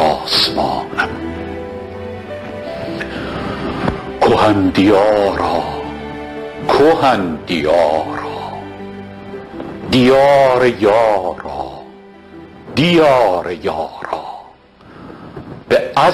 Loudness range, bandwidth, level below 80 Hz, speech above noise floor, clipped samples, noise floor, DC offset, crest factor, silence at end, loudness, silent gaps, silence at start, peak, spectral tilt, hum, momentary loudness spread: 5 LU; 13 kHz; -40 dBFS; 29 dB; under 0.1%; -42 dBFS; under 0.1%; 14 dB; 0 s; -15 LUFS; none; 0 s; -2 dBFS; -5.5 dB/octave; none; 20 LU